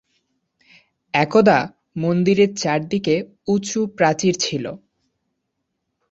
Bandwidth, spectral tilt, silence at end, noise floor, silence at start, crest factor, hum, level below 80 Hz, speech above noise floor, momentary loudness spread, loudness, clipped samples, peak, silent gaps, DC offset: 8 kHz; -5 dB/octave; 1.35 s; -76 dBFS; 1.15 s; 18 dB; none; -60 dBFS; 58 dB; 11 LU; -19 LUFS; under 0.1%; -2 dBFS; none; under 0.1%